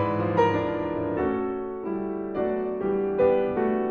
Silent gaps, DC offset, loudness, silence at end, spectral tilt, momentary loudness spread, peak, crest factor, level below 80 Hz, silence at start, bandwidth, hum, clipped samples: none; under 0.1%; -26 LUFS; 0 s; -9 dB/octave; 8 LU; -10 dBFS; 16 dB; -52 dBFS; 0 s; 6.6 kHz; none; under 0.1%